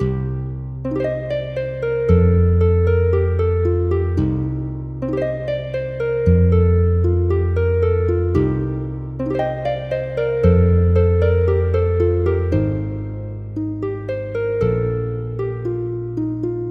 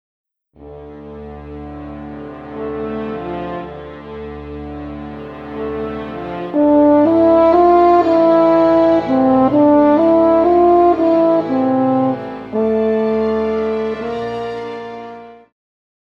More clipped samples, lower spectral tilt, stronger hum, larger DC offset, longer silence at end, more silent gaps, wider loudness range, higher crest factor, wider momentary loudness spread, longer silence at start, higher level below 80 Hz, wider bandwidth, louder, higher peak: neither; first, -10.5 dB/octave vs -9 dB/octave; neither; neither; second, 0 s vs 0.7 s; neither; second, 5 LU vs 16 LU; about the same, 14 dB vs 14 dB; second, 10 LU vs 20 LU; second, 0 s vs 0.6 s; first, -30 dBFS vs -42 dBFS; second, 4.3 kHz vs 6 kHz; second, -19 LUFS vs -14 LUFS; about the same, -2 dBFS vs -2 dBFS